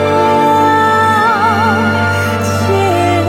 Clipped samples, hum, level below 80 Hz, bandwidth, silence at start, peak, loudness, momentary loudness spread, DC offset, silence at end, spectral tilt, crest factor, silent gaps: under 0.1%; none; -50 dBFS; 16.5 kHz; 0 s; 0 dBFS; -11 LUFS; 4 LU; under 0.1%; 0 s; -5.5 dB/octave; 10 dB; none